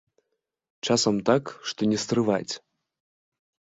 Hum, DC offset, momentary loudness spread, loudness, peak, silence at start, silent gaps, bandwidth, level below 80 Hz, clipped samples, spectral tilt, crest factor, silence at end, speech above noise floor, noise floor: none; under 0.1%; 12 LU; -25 LUFS; -8 dBFS; 0.85 s; none; 8 kHz; -64 dBFS; under 0.1%; -4.5 dB/octave; 20 dB; 1.2 s; 56 dB; -80 dBFS